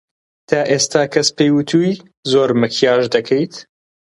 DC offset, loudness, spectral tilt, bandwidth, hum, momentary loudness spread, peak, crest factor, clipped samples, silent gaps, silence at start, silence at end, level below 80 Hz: under 0.1%; -16 LUFS; -4.5 dB/octave; 11.5 kHz; none; 6 LU; 0 dBFS; 16 dB; under 0.1%; 2.17-2.23 s; 0.5 s; 0.45 s; -60 dBFS